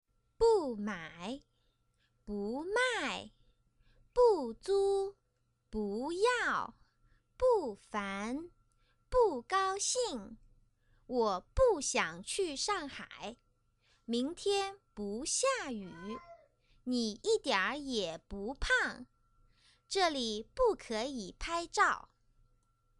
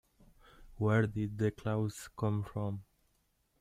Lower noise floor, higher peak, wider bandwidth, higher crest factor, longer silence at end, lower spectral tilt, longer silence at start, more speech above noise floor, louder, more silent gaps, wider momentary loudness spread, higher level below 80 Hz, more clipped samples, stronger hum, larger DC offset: about the same, -78 dBFS vs -76 dBFS; about the same, -16 dBFS vs -18 dBFS; second, 11.5 kHz vs 14 kHz; about the same, 20 dB vs 18 dB; first, 1 s vs 0.8 s; second, -2.5 dB/octave vs -7.5 dB/octave; second, 0.4 s vs 0.6 s; about the same, 44 dB vs 42 dB; about the same, -34 LUFS vs -35 LUFS; neither; first, 14 LU vs 9 LU; first, -54 dBFS vs -60 dBFS; neither; neither; neither